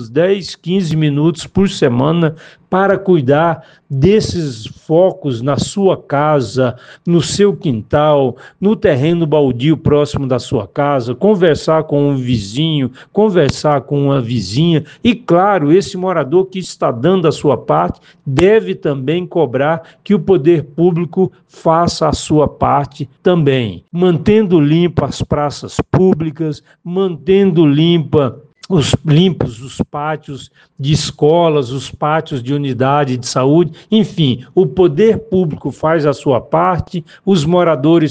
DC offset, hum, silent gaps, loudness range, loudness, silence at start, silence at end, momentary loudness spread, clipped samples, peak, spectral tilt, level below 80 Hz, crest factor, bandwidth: under 0.1%; none; none; 1 LU; -14 LUFS; 0 s; 0 s; 8 LU; under 0.1%; 0 dBFS; -6.5 dB/octave; -40 dBFS; 14 dB; 9.4 kHz